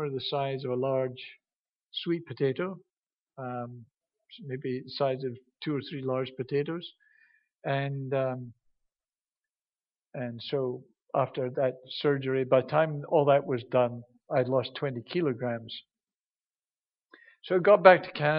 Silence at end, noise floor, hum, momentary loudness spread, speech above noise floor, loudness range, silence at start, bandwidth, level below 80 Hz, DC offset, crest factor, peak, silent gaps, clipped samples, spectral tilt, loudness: 0 s; under -90 dBFS; none; 16 LU; over 62 dB; 9 LU; 0 s; 5.6 kHz; -76 dBFS; under 0.1%; 28 dB; -2 dBFS; 1.58-1.65 s, 1.76-1.80 s, 2.97-3.01 s, 3.20-3.26 s, 16.19-16.34 s; under 0.1%; -4.5 dB/octave; -29 LUFS